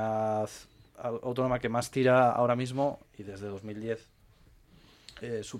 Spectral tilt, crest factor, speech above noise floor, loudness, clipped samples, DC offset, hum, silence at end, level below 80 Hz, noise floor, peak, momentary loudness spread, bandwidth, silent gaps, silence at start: -6 dB/octave; 20 dB; 30 dB; -30 LUFS; under 0.1%; under 0.1%; none; 0 s; -60 dBFS; -60 dBFS; -12 dBFS; 20 LU; 14.5 kHz; none; 0 s